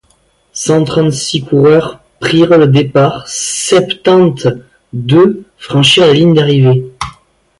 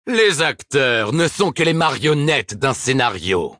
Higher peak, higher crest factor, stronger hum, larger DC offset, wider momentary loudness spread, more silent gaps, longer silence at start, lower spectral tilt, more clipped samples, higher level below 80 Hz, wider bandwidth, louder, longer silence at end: about the same, 0 dBFS vs -2 dBFS; second, 10 dB vs 16 dB; neither; neither; first, 16 LU vs 3 LU; neither; first, 0.55 s vs 0.05 s; about the same, -5 dB/octave vs -4 dB/octave; neither; first, -44 dBFS vs -52 dBFS; about the same, 11.5 kHz vs 10.5 kHz; first, -10 LUFS vs -17 LUFS; first, 0.5 s vs 0.05 s